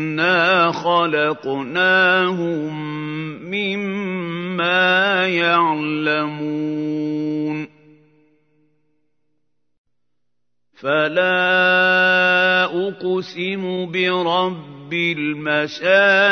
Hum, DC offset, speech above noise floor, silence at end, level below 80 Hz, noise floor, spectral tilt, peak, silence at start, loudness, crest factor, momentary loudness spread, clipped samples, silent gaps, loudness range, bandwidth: 60 Hz at -55 dBFS; under 0.1%; 62 dB; 0 s; -76 dBFS; -80 dBFS; -5.5 dB/octave; -2 dBFS; 0 s; -18 LUFS; 18 dB; 11 LU; under 0.1%; 9.78-9.84 s; 11 LU; 6.6 kHz